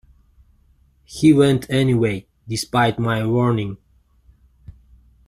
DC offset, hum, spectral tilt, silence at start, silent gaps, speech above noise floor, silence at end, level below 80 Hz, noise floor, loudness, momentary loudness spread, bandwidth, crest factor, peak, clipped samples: under 0.1%; none; -6.5 dB/octave; 1.1 s; none; 39 dB; 1.55 s; -48 dBFS; -56 dBFS; -19 LUFS; 16 LU; 14.5 kHz; 18 dB; -2 dBFS; under 0.1%